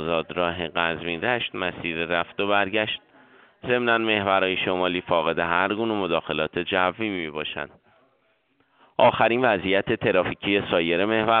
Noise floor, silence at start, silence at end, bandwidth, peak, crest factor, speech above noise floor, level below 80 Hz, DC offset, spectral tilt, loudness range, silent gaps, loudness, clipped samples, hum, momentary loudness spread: -67 dBFS; 0 s; 0 s; 4.7 kHz; -4 dBFS; 20 dB; 43 dB; -56 dBFS; under 0.1%; -2.5 dB/octave; 3 LU; none; -23 LUFS; under 0.1%; none; 8 LU